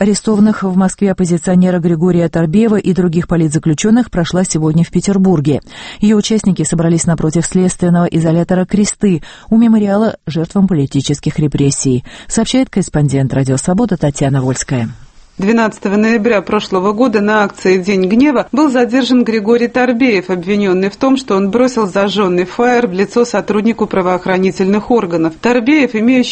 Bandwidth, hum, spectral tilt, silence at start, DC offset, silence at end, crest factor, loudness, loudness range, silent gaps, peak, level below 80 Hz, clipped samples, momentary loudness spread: 8.8 kHz; none; -6 dB/octave; 0 s; under 0.1%; 0 s; 12 dB; -12 LUFS; 2 LU; none; 0 dBFS; -38 dBFS; under 0.1%; 4 LU